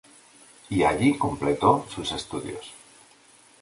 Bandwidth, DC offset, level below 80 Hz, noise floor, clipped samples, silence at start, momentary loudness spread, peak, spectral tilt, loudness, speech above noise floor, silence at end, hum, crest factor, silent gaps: 11.5 kHz; under 0.1%; -52 dBFS; -55 dBFS; under 0.1%; 0.7 s; 15 LU; -6 dBFS; -5.5 dB/octave; -24 LUFS; 31 dB; 0.85 s; none; 22 dB; none